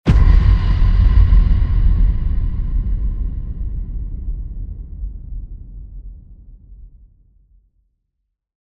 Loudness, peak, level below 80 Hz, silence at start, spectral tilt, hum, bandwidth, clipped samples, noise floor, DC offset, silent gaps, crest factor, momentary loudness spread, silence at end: -18 LUFS; 0 dBFS; -16 dBFS; 0.05 s; -9 dB/octave; none; 5 kHz; under 0.1%; -75 dBFS; under 0.1%; none; 16 dB; 23 LU; 1.75 s